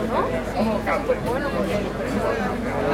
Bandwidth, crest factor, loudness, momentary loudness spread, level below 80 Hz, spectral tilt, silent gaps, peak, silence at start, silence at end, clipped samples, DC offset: 16.5 kHz; 16 dB; -24 LUFS; 2 LU; -38 dBFS; -6.5 dB/octave; none; -8 dBFS; 0 s; 0 s; under 0.1%; under 0.1%